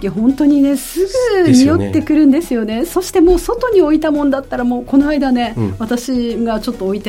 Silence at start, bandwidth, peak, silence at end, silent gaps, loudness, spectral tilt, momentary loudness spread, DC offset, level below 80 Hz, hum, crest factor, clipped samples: 0 s; 16.5 kHz; 0 dBFS; 0 s; none; -14 LUFS; -6 dB/octave; 8 LU; under 0.1%; -34 dBFS; none; 14 dB; under 0.1%